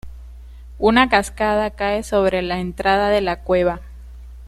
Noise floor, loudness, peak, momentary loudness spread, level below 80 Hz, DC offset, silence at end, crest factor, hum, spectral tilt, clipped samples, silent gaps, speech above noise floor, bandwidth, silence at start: -37 dBFS; -18 LUFS; -2 dBFS; 7 LU; -36 dBFS; under 0.1%; 0 s; 18 dB; none; -5 dB/octave; under 0.1%; none; 19 dB; 13.5 kHz; 0.05 s